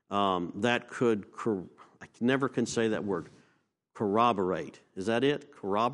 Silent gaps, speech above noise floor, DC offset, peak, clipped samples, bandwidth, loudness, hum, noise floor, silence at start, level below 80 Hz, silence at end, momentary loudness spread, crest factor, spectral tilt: none; 42 dB; under 0.1%; -10 dBFS; under 0.1%; 11.5 kHz; -30 LUFS; none; -72 dBFS; 0.1 s; -70 dBFS; 0 s; 10 LU; 20 dB; -5.5 dB/octave